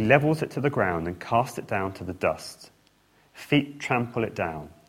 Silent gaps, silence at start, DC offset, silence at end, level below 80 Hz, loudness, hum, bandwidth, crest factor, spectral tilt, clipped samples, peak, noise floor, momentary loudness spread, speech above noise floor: none; 0 s; under 0.1%; 0.2 s; -58 dBFS; -27 LUFS; none; 16.5 kHz; 24 dB; -6.5 dB/octave; under 0.1%; -2 dBFS; -62 dBFS; 9 LU; 36 dB